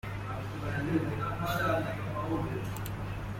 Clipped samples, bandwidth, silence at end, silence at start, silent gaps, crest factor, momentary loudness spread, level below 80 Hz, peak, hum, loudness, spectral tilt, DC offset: under 0.1%; 16.5 kHz; 0 s; 0.05 s; none; 16 dB; 7 LU; -48 dBFS; -16 dBFS; none; -34 LUFS; -6.5 dB/octave; under 0.1%